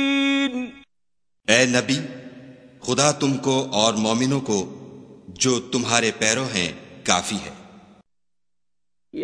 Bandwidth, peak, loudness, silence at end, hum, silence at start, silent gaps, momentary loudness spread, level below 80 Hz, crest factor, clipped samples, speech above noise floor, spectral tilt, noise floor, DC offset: 11 kHz; 0 dBFS; -21 LUFS; 0 s; none; 0 s; none; 16 LU; -60 dBFS; 24 dB; under 0.1%; 67 dB; -3 dB/octave; -88 dBFS; under 0.1%